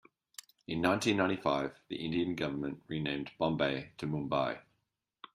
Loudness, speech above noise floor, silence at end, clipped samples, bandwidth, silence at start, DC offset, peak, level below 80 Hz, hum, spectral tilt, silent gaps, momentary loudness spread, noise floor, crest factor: -34 LUFS; 49 dB; 0.1 s; under 0.1%; 15.5 kHz; 0.7 s; under 0.1%; -12 dBFS; -64 dBFS; none; -5.5 dB/octave; none; 13 LU; -83 dBFS; 22 dB